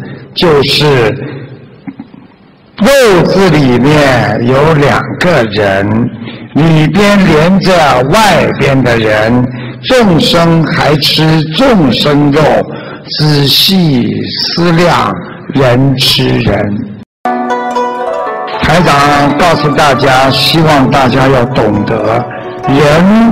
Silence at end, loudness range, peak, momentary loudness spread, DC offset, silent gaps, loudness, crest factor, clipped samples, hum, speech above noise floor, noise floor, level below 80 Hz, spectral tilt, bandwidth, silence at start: 0 s; 3 LU; 0 dBFS; 10 LU; under 0.1%; 17.06-17.24 s; -8 LUFS; 8 dB; under 0.1%; none; 33 dB; -39 dBFS; -32 dBFS; -5.5 dB/octave; 16.5 kHz; 0 s